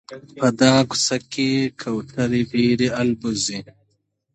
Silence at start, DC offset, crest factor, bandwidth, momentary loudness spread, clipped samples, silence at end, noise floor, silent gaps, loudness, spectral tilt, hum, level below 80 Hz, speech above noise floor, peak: 0.1 s; under 0.1%; 20 dB; 10.5 kHz; 10 LU; under 0.1%; 0.7 s; -69 dBFS; none; -20 LUFS; -4.5 dB/octave; none; -54 dBFS; 49 dB; -2 dBFS